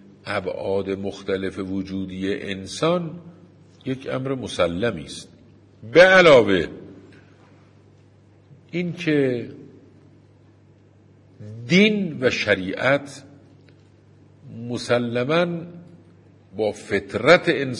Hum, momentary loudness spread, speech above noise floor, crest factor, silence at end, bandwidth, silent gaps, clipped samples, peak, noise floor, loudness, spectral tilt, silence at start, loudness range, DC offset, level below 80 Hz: none; 21 LU; 32 dB; 20 dB; 0 s; 11 kHz; none; under 0.1%; -2 dBFS; -53 dBFS; -20 LUFS; -5.5 dB/octave; 0.25 s; 10 LU; under 0.1%; -58 dBFS